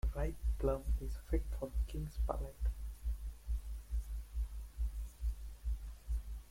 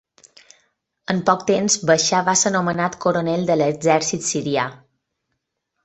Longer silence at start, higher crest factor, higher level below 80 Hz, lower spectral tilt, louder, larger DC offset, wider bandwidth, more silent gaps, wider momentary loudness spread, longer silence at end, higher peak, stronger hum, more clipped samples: second, 0.05 s vs 1.1 s; about the same, 18 dB vs 20 dB; first, -40 dBFS vs -60 dBFS; first, -7.5 dB/octave vs -3.5 dB/octave; second, -42 LUFS vs -19 LUFS; neither; first, 16 kHz vs 8.4 kHz; neither; about the same, 6 LU vs 7 LU; second, 0 s vs 1.1 s; second, -22 dBFS vs -2 dBFS; neither; neither